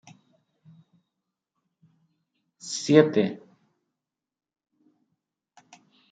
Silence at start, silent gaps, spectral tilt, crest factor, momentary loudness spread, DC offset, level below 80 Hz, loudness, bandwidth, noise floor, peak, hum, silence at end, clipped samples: 2.65 s; none; -5.5 dB/octave; 26 dB; 24 LU; under 0.1%; -78 dBFS; -22 LUFS; 9.4 kHz; -89 dBFS; -4 dBFS; none; 2.75 s; under 0.1%